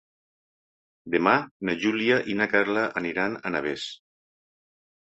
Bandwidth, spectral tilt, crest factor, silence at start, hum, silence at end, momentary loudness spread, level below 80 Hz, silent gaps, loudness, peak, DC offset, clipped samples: 8.2 kHz; -5.5 dB/octave; 24 dB; 1.05 s; none; 1.2 s; 8 LU; -66 dBFS; 1.51-1.60 s; -25 LUFS; -4 dBFS; under 0.1%; under 0.1%